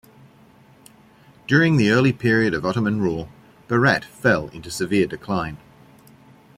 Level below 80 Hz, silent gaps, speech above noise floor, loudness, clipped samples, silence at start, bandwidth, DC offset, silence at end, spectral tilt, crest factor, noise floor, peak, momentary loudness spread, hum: -52 dBFS; none; 31 dB; -20 LUFS; under 0.1%; 1.5 s; 16 kHz; under 0.1%; 1 s; -6.5 dB/octave; 20 dB; -51 dBFS; -2 dBFS; 15 LU; none